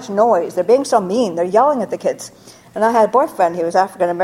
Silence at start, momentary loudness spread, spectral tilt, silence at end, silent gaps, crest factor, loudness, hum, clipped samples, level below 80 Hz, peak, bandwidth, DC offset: 0 s; 8 LU; -5 dB/octave; 0 s; none; 16 dB; -16 LUFS; none; under 0.1%; -62 dBFS; 0 dBFS; 16 kHz; under 0.1%